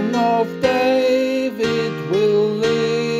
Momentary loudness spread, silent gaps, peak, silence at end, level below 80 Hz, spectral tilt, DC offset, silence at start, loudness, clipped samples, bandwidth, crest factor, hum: 4 LU; none; -4 dBFS; 0 s; -54 dBFS; -5.5 dB/octave; under 0.1%; 0 s; -18 LUFS; under 0.1%; 14.5 kHz; 12 dB; none